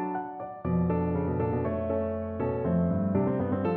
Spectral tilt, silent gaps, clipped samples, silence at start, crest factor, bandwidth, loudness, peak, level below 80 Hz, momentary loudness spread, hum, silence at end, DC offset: -10 dB/octave; none; under 0.1%; 0 s; 16 dB; 3.6 kHz; -29 LUFS; -14 dBFS; -48 dBFS; 6 LU; none; 0 s; under 0.1%